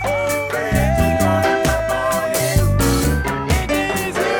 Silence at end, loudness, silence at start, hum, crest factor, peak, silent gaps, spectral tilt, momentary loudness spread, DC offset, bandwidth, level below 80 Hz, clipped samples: 0 s; -18 LUFS; 0 s; none; 16 dB; -2 dBFS; none; -5 dB/octave; 4 LU; under 0.1%; over 20 kHz; -26 dBFS; under 0.1%